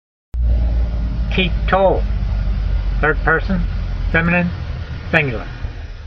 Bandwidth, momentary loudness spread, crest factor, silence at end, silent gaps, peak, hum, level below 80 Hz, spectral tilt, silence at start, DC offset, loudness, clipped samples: 6 kHz; 12 LU; 18 dB; 0 s; none; 0 dBFS; none; -20 dBFS; -8 dB/octave; 0.35 s; under 0.1%; -19 LUFS; under 0.1%